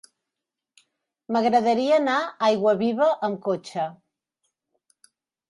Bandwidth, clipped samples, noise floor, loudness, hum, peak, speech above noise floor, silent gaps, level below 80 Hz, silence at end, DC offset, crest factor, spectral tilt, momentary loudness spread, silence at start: 11.5 kHz; under 0.1%; -86 dBFS; -23 LUFS; none; -8 dBFS; 64 dB; none; -74 dBFS; 1.55 s; under 0.1%; 18 dB; -5.5 dB/octave; 8 LU; 1.3 s